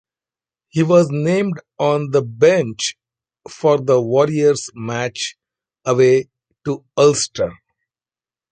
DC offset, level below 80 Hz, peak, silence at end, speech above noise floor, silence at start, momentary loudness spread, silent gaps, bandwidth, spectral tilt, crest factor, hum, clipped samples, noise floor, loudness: under 0.1%; -58 dBFS; -2 dBFS; 0.95 s; over 74 dB; 0.75 s; 12 LU; none; 9.4 kHz; -5 dB/octave; 16 dB; none; under 0.1%; under -90 dBFS; -17 LUFS